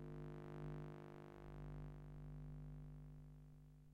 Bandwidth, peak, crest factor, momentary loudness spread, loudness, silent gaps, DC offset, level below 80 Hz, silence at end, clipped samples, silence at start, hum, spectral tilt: 7.8 kHz; -38 dBFS; 16 dB; 9 LU; -56 LUFS; none; under 0.1%; -62 dBFS; 0 s; under 0.1%; 0 s; 50 Hz at -55 dBFS; -9 dB/octave